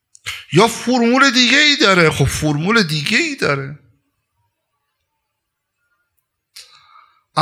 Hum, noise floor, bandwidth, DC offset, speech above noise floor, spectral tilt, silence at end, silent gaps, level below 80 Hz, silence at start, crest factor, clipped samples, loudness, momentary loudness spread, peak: none; -75 dBFS; 16 kHz; under 0.1%; 61 dB; -4 dB/octave; 0 s; none; -44 dBFS; 0.25 s; 18 dB; under 0.1%; -13 LUFS; 13 LU; 0 dBFS